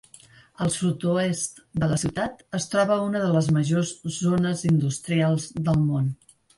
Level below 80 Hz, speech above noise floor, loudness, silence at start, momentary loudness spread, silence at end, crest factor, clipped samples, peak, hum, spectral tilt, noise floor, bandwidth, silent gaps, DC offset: -52 dBFS; 28 dB; -24 LUFS; 0.6 s; 7 LU; 0.45 s; 14 dB; under 0.1%; -10 dBFS; none; -6 dB/octave; -52 dBFS; 11.5 kHz; none; under 0.1%